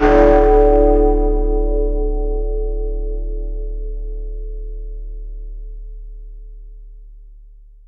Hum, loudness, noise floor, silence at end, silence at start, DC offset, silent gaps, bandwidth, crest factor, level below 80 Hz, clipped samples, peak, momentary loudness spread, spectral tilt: none; -17 LUFS; -41 dBFS; 0.4 s; 0 s; under 0.1%; none; 3.8 kHz; 16 dB; -20 dBFS; under 0.1%; 0 dBFS; 25 LU; -9 dB/octave